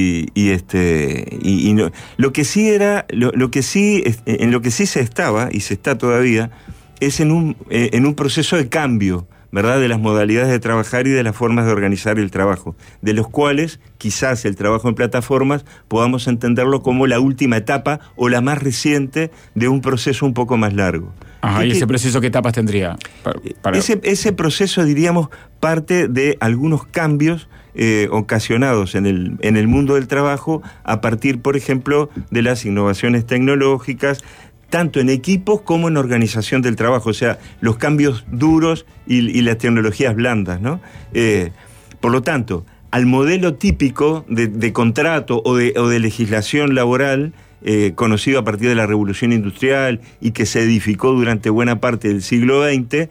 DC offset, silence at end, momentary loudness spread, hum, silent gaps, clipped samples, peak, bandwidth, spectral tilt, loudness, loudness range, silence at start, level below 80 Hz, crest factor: under 0.1%; 0.05 s; 6 LU; none; none; under 0.1%; -4 dBFS; 16 kHz; -6 dB/octave; -16 LUFS; 2 LU; 0 s; -42 dBFS; 12 dB